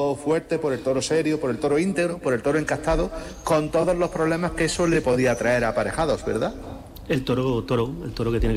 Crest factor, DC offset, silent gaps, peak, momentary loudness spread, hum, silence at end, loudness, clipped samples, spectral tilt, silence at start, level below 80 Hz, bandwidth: 10 dB; under 0.1%; none; -12 dBFS; 6 LU; none; 0 s; -23 LUFS; under 0.1%; -5.5 dB/octave; 0 s; -38 dBFS; 15.5 kHz